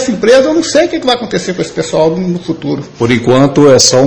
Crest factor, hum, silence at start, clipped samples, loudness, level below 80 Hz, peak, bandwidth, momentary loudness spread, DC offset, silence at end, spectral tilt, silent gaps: 10 dB; none; 0 s; 1%; -10 LUFS; -42 dBFS; 0 dBFS; 11 kHz; 11 LU; under 0.1%; 0 s; -4 dB/octave; none